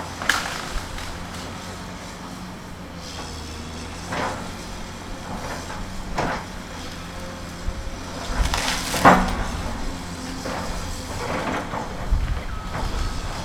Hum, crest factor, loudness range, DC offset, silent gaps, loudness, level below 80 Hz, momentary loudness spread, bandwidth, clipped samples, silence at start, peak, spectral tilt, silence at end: none; 26 dB; 10 LU; under 0.1%; none; -27 LUFS; -32 dBFS; 12 LU; 18 kHz; under 0.1%; 0 s; 0 dBFS; -4 dB/octave; 0 s